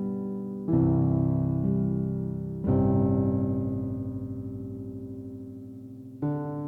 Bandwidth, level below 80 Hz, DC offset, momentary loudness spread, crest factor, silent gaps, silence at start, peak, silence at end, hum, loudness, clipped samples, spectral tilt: 2.3 kHz; -48 dBFS; under 0.1%; 16 LU; 14 dB; none; 0 s; -12 dBFS; 0 s; none; -28 LUFS; under 0.1%; -13 dB/octave